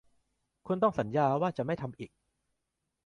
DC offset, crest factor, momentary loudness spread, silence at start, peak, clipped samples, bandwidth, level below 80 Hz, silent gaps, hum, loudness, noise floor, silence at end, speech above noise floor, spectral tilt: under 0.1%; 20 dB; 15 LU; 0.65 s; -14 dBFS; under 0.1%; 10.5 kHz; -66 dBFS; none; none; -31 LUFS; -84 dBFS; 1 s; 54 dB; -8.5 dB/octave